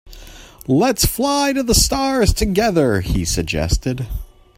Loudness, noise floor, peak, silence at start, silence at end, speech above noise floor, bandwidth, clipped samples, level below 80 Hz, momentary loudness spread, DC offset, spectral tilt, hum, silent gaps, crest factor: -17 LUFS; -39 dBFS; 0 dBFS; 0.05 s; 0.3 s; 22 dB; 16.5 kHz; under 0.1%; -26 dBFS; 10 LU; under 0.1%; -4 dB/octave; none; none; 18 dB